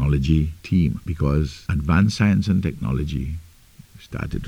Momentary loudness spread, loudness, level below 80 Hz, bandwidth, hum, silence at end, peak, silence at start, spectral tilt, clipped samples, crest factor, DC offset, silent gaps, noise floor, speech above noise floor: 12 LU; -22 LUFS; -30 dBFS; 15 kHz; none; 0 s; -6 dBFS; 0 s; -7.5 dB/octave; under 0.1%; 16 dB; under 0.1%; none; -48 dBFS; 27 dB